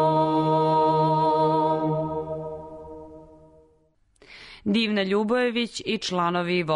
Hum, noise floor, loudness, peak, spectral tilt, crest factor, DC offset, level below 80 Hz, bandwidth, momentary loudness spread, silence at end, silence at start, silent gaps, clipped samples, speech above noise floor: none; -63 dBFS; -23 LUFS; -12 dBFS; -6 dB/octave; 12 dB; under 0.1%; -58 dBFS; 10.5 kHz; 18 LU; 0 s; 0 s; none; under 0.1%; 39 dB